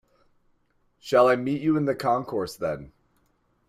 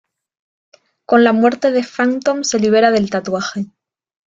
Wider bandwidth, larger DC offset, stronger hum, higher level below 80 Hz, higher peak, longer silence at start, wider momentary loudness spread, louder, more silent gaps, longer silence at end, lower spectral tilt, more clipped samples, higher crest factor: first, 15.5 kHz vs 7.8 kHz; neither; first, 60 Hz at -55 dBFS vs none; about the same, -60 dBFS vs -58 dBFS; second, -8 dBFS vs -2 dBFS; about the same, 1.05 s vs 1.1 s; first, 12 LU vs 9 LU; second, -24 LUFS vs -15 LUFS; neither; first, 0.8 s vs 0.65 s; first, -6.5 dB/octave vs -4.5 dB/octave; neither; first, 20 dB vs 14 dB